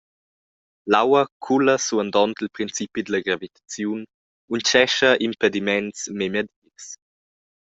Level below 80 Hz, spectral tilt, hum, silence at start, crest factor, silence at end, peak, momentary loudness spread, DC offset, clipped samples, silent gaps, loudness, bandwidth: -64 dBFS; -3 dB/octave; none; 0.85 s; 20 dB; 0.7 s; -2 dBFS; 18 LU; under 0.1%; under 0.1%; 1.32-1.40 s, 4.14-4.48 s, 6.56-6.62 s; -21 LUFS; 8 kHz